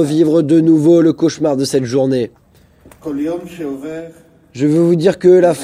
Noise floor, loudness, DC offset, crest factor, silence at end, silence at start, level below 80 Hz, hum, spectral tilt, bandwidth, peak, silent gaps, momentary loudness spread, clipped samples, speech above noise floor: -46 dBFS; -13 LUFS; under 0.1%; 14 dB; 0 s; 0 s; -54 dBFS; none; -7 dB/octave; 13.5 kHz; 0 dBFS; none; 16 LU; under 0.1%; 34 dB